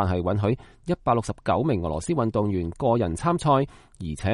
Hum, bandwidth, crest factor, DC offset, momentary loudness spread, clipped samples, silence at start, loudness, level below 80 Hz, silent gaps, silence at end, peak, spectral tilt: none; 11.5 kHz; 16 dB; under 0.1%; 8 LU; under 0.1%; 0 s; -25 LUFS; -44 dBFS; none; 0 s; -8 dBFS; -7 dB/octave